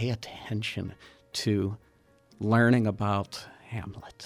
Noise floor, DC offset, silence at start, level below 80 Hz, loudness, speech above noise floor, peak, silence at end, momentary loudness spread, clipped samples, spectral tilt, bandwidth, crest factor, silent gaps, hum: -61 dBFS; under 0.1%; 0 s; -60 dBFS; -29 LUFS; 33 dB; -12 dBFS; 0 s; 17 LU; under 0.1%; -6 dB/octave; 14.5 kHz; 18 dB; none; none